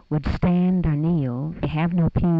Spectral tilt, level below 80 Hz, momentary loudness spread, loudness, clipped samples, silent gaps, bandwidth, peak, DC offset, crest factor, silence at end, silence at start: -10.5 dB/octave; -34 dBFS; 6 LU; -22 LUFS; under 0.1%; none; 5.4 kHz; -12 dBFS; under 0.1%; 10 dB; 0 s; 0.1 s